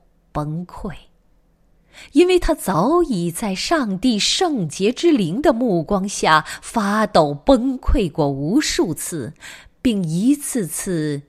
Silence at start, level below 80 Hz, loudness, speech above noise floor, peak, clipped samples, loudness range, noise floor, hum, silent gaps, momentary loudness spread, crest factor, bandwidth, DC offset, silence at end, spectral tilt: 0.35 s; -32 dBFS; -19 LUFS; 38 dB; 0 dBFS; under 0.1%; 3 LU; -57 dBFS; none; none; 12 LU; 18 dB; 15 kHz; under 0.1%; 0.05 s; -4.5 dB/octave